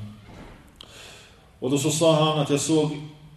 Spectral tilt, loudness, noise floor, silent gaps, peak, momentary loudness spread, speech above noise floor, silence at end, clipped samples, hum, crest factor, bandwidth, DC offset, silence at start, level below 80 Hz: -5 dB/octave; -22 LUFS; -50 dBFS; none; -6 dBFS; 24 LU; 28 dB; 0.1 s; under 0.1%; none; 18 dB; 13.5 kHz; under 0.1%; 0 s; -56 dBFS